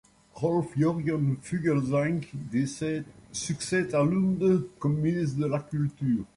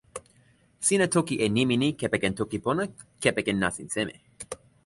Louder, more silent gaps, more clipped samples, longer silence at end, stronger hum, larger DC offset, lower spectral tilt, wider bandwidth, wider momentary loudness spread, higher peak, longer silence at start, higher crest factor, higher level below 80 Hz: about the same, -28 LUFS vs -26 LUFS; neither; neither; second, 0.1 s vs 0.3 s; neither; neither; first, -6.5 dB/octave vs -4 dB/octave; about the same, 11.5 kHz vs 12 kHz; second, 7 LU vs 17 LU; second, -14 dBFS vs -6 dBFS; first, 0.35 s vs 0.15 s; second, 14 dB vs 20 dB; about the same, -58 dBFS vs -56 dBFS